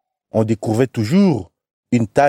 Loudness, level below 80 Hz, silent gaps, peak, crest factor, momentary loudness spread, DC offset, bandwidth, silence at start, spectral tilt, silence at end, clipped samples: -18 LUFS; -52 dBFS; 1.73-1.83 s; -2 dBFS; 16 dB; 7 LU; under 0.1%; 14 kHz; 0.35 s; -7.5 dB/octave; 0 s; under 0.1%